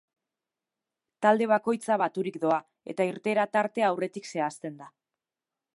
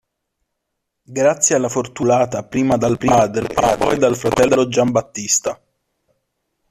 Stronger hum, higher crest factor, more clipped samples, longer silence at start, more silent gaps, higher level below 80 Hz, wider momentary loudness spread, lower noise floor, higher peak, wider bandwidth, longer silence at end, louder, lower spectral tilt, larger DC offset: neither; about the same, 20 dB vs 16 dB; neither; about the same, 1.2 s vs 1.1 s; neither; second, -82 dBFS vs -46 dBFS; first, 9 LU vs 6 LU; first, under -90 dBFS vs -76 dBFS; second, -8 dBFS vs -2 dBFS; second, 11.5 kHz vs 14.5 kHz; second, 0.85 s vs 1.15 s; second, -27 LUFS vs -17 LUFS; first, -5.5 dB/octave vs -4 dB/octave; neither